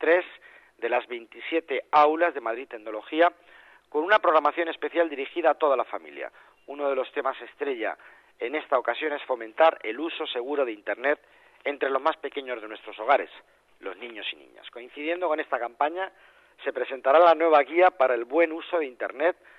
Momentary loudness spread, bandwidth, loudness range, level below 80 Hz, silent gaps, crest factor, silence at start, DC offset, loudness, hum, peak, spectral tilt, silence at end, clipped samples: 16 LU; 6 kHz; 8 LU; -78 dBFS; none; 18 dB; 0 s; under 0.1%; -26 LUFS; none; -8 dBFS; -4.5 dB/octave; 0.25 s; under 0.1%